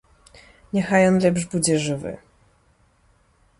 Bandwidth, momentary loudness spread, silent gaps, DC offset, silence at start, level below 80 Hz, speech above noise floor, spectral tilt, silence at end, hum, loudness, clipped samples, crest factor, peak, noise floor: 11.5 kHz; 14 LU; none; under 0.1%; 0.75 s; -54 dBFS; 40 dB; -5 dB/octave; 1.45 s; none; -20 LUFS; under 0.1%; 18 dB; -6 dBFS; -60 dBFS